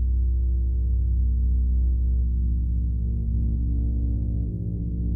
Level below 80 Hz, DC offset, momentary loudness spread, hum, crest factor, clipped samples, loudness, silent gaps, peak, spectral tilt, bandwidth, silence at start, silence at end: -22 dBFS; under 0.1%; 4 LU; none; 8 dB; under 0.1%; -26 LUFS; none; -14 dBFS; -14 dB/octave; 0.7 kHz; 0 s; 0 s